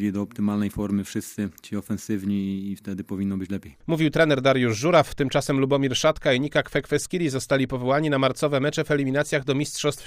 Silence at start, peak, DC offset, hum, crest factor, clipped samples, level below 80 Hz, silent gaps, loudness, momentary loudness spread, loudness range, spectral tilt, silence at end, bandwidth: 0 s; -6 dBFS; under 0.1%; none; 18 dB; under 0.1%; -50 dBFS; none; -24 LUFS; 11 LU; 7 LU; -5.5 dB/octave; 0 s; 15.5 kHz